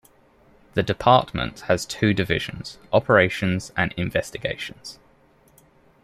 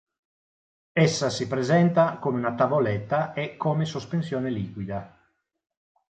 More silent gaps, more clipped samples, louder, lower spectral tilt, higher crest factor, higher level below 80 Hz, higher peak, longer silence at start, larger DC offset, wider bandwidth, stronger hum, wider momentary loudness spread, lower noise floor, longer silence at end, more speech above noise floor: neither; neither; first, -22 LUFS vs -25 LUFS; about the same, -5.5 dB/octave vs -6 dB/octave; about the same, 22 dB vs 18 dB; first, -48 dBFS vs -60 dBFS; first, -2 dBFS vs -8 dBFS; second, 0.75 s vs 0.95 s; neither; first, 15.5 kHz vs 9 kHz; neither; first, 14 LU vs 10 LU; second, -57 dBFS vs -69 dBFS; about the same, 1.1 s vs 1.1 s; second, 35 dB vs 44 dB